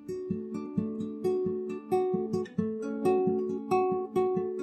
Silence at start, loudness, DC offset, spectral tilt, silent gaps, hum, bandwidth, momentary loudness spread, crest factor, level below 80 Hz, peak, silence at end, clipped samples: 0 s; -31 LUFS; under 0.1%; -8.5 dB/octave; none; none; 12.5 kHz; 8 LU; 14 dB; -68 dBFS; -16 dBFS; 0 s; under 0.1%